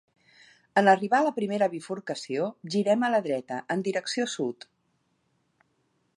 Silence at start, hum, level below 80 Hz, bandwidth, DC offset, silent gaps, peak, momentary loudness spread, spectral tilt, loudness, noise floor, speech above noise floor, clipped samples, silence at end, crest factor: 0.75 s; none; -80 dBFS; 11.5 kHz; under 0.1%; none; -6 dBFS; 12 LU; -5 dB/octave; -27 LUFS; -73 dBFS; 46 dB; under 0.1%; 1.65 s; 22 dB